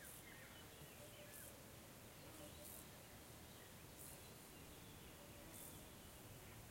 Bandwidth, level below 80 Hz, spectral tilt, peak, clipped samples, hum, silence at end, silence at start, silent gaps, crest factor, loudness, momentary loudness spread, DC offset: 16.5 kHz; -72 dBFS; -3.5 dB/octave; -44 dBFS; under 0.1%; none; 0 s; 0 s; none; 16 dB; -58 LUFS; 3 LU; under 0.1%